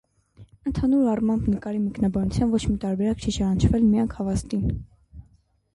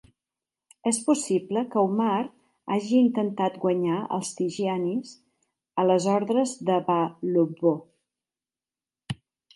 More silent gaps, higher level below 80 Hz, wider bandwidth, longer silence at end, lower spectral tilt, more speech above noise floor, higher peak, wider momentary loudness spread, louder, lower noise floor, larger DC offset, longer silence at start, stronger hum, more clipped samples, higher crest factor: neither; first, -36 dBFS vs -70 dBFS; about the same, 11.5 kHz vs 11.5 kHz; first, 0.55 s vs 0.4 s; first, -7.5 dB/octave vs -5.5 dB/octave; second, 38 dB vs over 66 dB; first, -6 dBFS vs -10 dBFS; second, 8 LU vs 12 LU; about the same, -24 LUFS vs -25 LUFS; second, -61 dBFS vs under -90 dBFS; neither; second, 0.4 s vs 0.85 s; neither; neither; about the same, 16 dB vs 18 dB